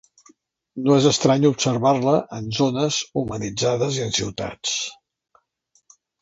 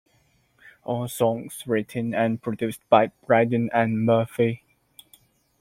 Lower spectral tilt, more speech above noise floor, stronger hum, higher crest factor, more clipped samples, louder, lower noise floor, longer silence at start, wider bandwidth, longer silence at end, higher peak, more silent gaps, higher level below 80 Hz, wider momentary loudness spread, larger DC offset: second, -4.5 dB/octave vs -6.5 dB/octave; first, 45 dB vs 41 dB; neither; about the same, 20 dB vs 22 dB; neither; about the same, -21 LUFS vs -23 LUFS; about the same, -66 dBFS vs -64 dBFS; about the same, 0.75 s vs 0.85 s; second, 8 kHz vs 16.5 kHz; first, 1.3 s vs 1.05 s; about the same, -2 dBFS vs -2 dBFS; neither; first, -54 dBFS vs -64 dBFS; about the same, 10 LU vs 10 LU; neither